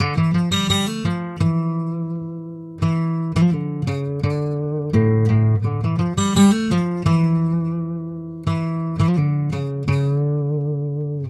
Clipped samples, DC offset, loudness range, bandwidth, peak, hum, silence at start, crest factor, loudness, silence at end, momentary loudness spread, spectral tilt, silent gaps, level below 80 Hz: under 0.1%; under 0.1%; 4 LU; 12 kHz; -4 dBFS; none; 0 s; 16 dB; -20 LUFS; 0 s; 9 LU; -6.5 dB/octave; none; -46 dBFS